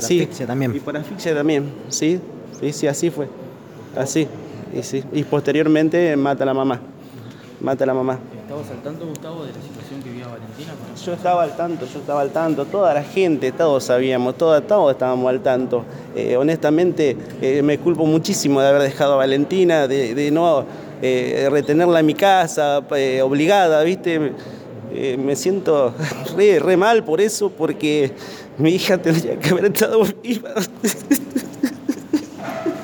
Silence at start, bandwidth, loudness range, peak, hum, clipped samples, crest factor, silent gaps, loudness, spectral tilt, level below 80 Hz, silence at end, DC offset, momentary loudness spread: 0 s; 19 kHz; 7 LU; -4 dBFS; none; under 0.1%; 16 dB; none; -18 LUFS; -5.5 dB/octave; -62 dBFS; 0 s; under 0.1%; 16 LU